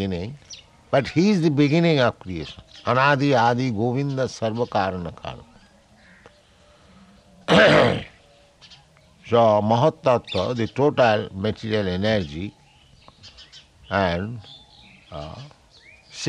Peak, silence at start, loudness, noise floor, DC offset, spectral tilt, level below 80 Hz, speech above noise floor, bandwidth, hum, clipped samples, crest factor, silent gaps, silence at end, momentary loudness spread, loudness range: -4 dBFS; 0 s; -21 LUFS; -54 dBFS; under 0.1%; -6 dB/octave; -54 dBFS; 33 dB; 10.5 kHz; none; under 0.1%; 18 dB; none; 0 s; 19 LU; 10 LU